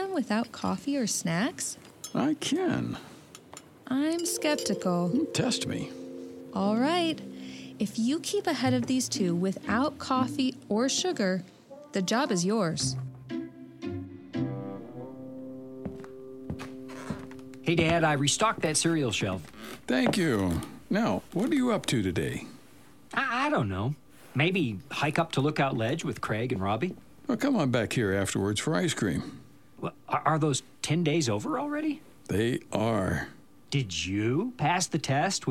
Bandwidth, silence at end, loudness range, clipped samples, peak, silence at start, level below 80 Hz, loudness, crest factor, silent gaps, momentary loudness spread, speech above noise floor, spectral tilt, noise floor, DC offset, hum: 16.5 kHz; 0 s; 4 LU; under 0.1%; -8 dBFS; 0 s; -58 dBFS; -29 LUFS; 20 dB; none; 15 LU; 27 dB; -4.5 dB/octave; -55 dBFS; under 0.1%; none